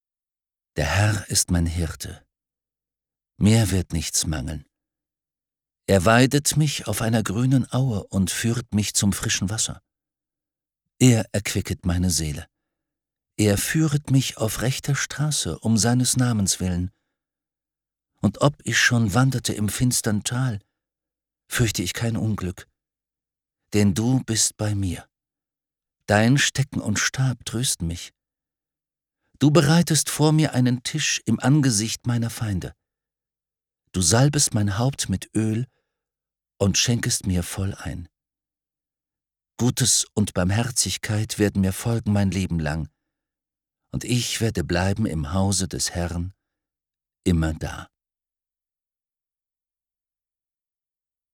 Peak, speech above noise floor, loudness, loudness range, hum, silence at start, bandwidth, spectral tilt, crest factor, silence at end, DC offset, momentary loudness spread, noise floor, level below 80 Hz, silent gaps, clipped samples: -2 dBFS; over 68 dB; -22 LUFS; 5 LU; none; 0.75 s; 18.5 kHz; -4.5 dB/octave; 20 dB; 3.5 s; under 0.1%; 11 LU; under -90 dBFS; -44 dBFS; none; under 0.1%